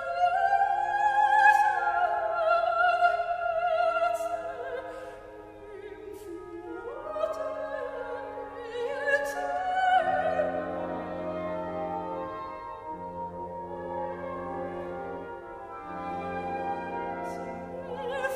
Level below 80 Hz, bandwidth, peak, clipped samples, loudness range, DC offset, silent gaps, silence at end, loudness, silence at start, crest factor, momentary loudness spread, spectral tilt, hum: -60 dBFS; 14.5 kHz; -8 dBFS; under 0.1%; 13 LU; under 0.1%; none; 0 s; -29 LUFS; 0 s; 20 dB; 17 LU; -5 dB/octave; none